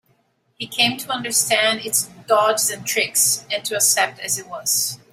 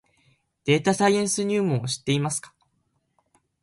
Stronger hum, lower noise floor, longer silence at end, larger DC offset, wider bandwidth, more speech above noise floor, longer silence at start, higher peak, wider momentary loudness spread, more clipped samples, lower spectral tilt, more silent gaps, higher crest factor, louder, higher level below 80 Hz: neither; second, -64 dBFS vs -72 dBFS; second, 0.15 s vs 1.15 s; neither; first, 16.5 kHz vs 11.5 kHz; second, 43 dB vs 49 dB; about the same, 0.6 s vs 0.65 s; first, -2 dBFS vs -6 dBFS; about the same, 8 LU vs 8 LU; neither; second, -0.5 dB/octave vs -4.5 dB/octave; neither; about the same, 18 dB vs 20 dB; first, -18 LUFS vs -24 LUFS; about the same, -66 dBFS vs -62 dBFS